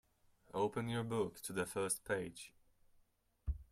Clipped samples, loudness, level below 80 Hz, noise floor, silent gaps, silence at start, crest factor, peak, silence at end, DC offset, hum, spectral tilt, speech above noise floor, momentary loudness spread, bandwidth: under 0.1%; -41 LUFS; -54 dBFS; -75 dBFS; none; 0.5 s; 18 dB; -24 dBFS; 0.1 s; under 0.1%; none; -4.5 dB/octave; 34 dB; 11 LU; 16 kHz